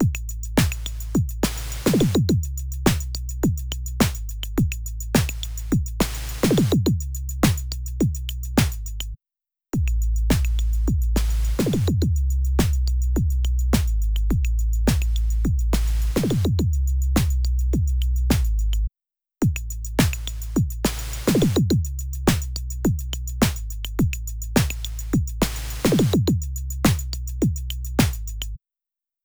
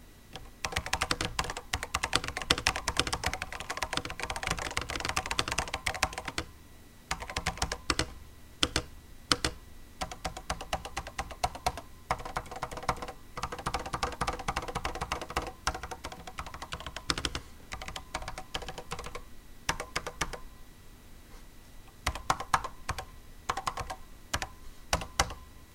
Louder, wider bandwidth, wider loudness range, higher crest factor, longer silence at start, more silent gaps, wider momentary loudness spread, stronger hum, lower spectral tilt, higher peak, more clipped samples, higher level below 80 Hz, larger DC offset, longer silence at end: first, -23 LUFS vs -34 LUFS; first, over 20 kHz vs 17 kHz; second, 2 LU vs 7 LU; second, 18 dB vs 34 dB; about the same, 0 s vs 0 s; neither; second, 9 LU vs 18 LU; neither; first, -5.5 dB/octave vs -2.5 dB/octave; about the same, -4 dBFS vs -2 dBFS; neither; first, -26 dBFS vs -46 dBFS; neither; first, 0.65 s vs 0 s